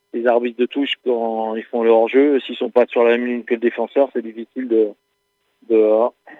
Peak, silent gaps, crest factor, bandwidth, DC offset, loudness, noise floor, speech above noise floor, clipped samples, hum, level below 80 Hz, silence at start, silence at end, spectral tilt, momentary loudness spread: -2 dBFS; none; 16 dB; 4.1 kHz; under 0.1%; -18 LUFS; -69 dBFS; 51 dB; under 0.1%; none; -78 dBFS; 0.15 s; 0.05 s; -6.5 dB/octave; 8 LU